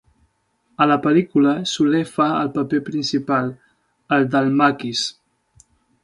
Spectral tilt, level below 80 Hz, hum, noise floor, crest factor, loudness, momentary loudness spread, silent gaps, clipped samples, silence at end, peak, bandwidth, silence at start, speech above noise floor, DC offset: -5.5 dB/octave; -62 dBFS; none; -65 dBFS; 18 dB; -19 LUFS; 6 LU; none; under 0.1%; 0.95 s; -2 dBFS; 11.5 kHz; 0.8 s; 47 dB; under 0.1%